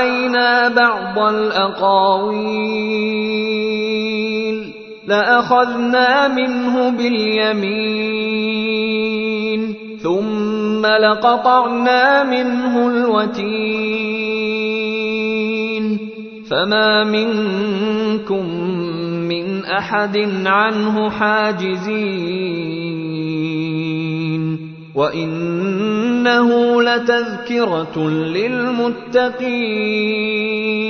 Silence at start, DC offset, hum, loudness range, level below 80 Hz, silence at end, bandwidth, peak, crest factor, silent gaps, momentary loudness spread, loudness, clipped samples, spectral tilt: 0 s; under 0.1%; none; 4 LU; -58 dBFS; 0 s; 6.6 kHz; 0 dBFS; 16 dB; none; 8 LU; -17 LUFS; under 0.1%; -6 dB/octave